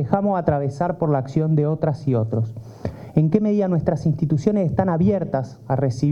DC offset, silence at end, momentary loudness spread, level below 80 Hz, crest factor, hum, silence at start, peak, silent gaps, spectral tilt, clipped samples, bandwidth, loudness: under 0.1%; 0 s; 7 LU; -50 dBFS; 16 dB; none; 0 s; -4 dBFS; none; -9.5 dB/octave; under 0.1%; 7.6 kHz; -21 LUFS